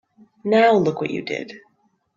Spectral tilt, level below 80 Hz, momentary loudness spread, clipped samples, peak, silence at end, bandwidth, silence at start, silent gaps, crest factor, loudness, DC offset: -6.5 dB/octave; -64 dBFS; 16 LU; under 0.1%; -4 dBFS; 0.6 s; 7.6 kHz; 0.45 s; none; 18 dB; -19 LUFS; under 0.1%